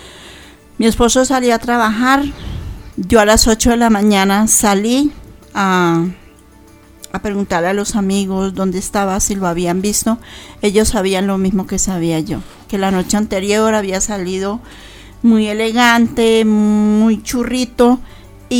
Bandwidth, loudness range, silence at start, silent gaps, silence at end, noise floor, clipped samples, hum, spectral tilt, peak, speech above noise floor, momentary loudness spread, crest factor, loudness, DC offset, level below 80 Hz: over 20 kHz; 5 LU; 0 s; none; 0 s; -42 dBFS; under 0.1%; none; -4 dB/octave; 0 dBFS; 29 dB; 12 LU; 14 dB; -14 LUFS; under 0.1%; -32 dBFS